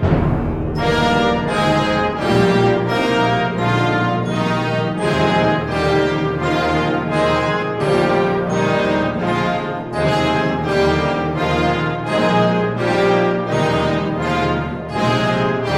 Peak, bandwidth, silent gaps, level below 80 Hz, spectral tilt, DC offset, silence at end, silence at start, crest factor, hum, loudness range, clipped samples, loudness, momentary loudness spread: -4 dBFS; 13 kHz; none; -36 dBFS; -6.5 dB/octave; under 0.1%; 0 s; 0 s; 14 dB; none; 1 LU; under 0.1%; -17 LUFS; 4 LU